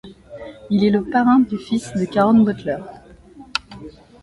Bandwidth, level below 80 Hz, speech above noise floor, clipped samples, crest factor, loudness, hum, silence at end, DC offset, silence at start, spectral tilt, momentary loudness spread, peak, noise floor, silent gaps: 11.5 kHz; -50 dBFS; 26 dB; under 0.1%; 18 dB; -18 LUFS; none; 0.3 s; under 0.1%; 0.05 s; -6.5 dB/octave; 23 LU; -2 dBFS; -43 dBFS; none